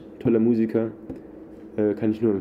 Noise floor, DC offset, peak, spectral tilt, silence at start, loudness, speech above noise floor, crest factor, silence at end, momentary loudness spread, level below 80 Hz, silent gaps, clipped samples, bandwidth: -42 dBFS; under 0.1%; -8 dBFS; -10.5 dB/octave; 0 s; -23 LUFS; 20 dB; 14 dB; 0 s; 19 LU; -58 dBFS; none; under 0.1%; 5.2 kHz